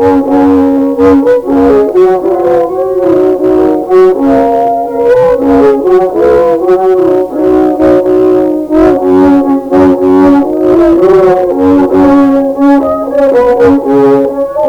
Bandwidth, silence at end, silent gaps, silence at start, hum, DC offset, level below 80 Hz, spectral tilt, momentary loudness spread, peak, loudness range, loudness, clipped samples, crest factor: 7.8 kHz; 0 s; none; 0 s; none; under 0.1%; -34 dBFS; -8 dB/octave; 4 LU; 0 dBFS; 1 LU; -7 LUFS; 0.6%; 6 dB